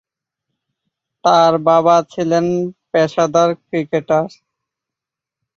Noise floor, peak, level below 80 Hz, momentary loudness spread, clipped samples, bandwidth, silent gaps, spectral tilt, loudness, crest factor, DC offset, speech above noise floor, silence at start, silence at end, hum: -86 dBFS; -2 dBFS; -62 dBFS; 8 LU; under 0.1%; 7.4 kHz; none; -5.5 dB/octave; -15 LUFS; 16 dB; under 0.1%; 71 dB; 1.25 s; 1.3 s; none